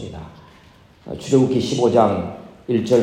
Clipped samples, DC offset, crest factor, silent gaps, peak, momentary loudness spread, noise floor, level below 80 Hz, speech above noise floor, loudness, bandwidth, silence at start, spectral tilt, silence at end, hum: under 0.1%; under 0.1%; 18 dB; none; -2 dBFS; 19 LU; -49 dBFS; -52 dBFS; 31 dB; -18 LUFS; 13.5 kHz; 0 s; -6.5 dB/octave; 0 s; none